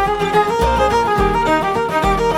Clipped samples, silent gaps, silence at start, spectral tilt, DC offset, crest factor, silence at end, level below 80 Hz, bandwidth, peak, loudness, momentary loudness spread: under 0.1%; none; 0 s; -5.5 dB/octave; under 0.1%; 14 dB; 0 s; -28 dBFS; 17.5 kHz; -2 dBFS; -16 LUFS; 2 LU